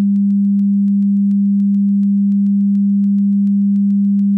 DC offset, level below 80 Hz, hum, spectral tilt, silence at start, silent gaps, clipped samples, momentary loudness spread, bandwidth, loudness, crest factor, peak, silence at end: under 0.1%; -70 dBFS; none; -12.5 dB/octave; 0 s; none; under 0.1%; 0 LU; 0.3 kHz; -14 LUFS; 4 dB; -10 dBFS; 0 s